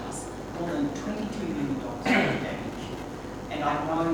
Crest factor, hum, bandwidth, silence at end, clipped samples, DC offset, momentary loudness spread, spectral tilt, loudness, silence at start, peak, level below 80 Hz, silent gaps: 20 dB; none; 19.5 kHz; 0 s; under 0.1%; under 0.1%; 13 LU; -5.5 dB/octave; -30 LUFS; 0 s; -10 dBFS; -48 dBFS; none